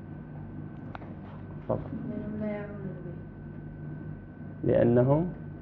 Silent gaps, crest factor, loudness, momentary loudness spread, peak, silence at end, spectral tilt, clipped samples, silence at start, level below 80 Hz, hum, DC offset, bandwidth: none; 22 dB; -31 LUFS; 19 LU; -10 dBFS; 0 s; -12.5 dB/octave; under 0.1%; 0 s; -52 dBFS; none; under 0.1%; 4.2 kHz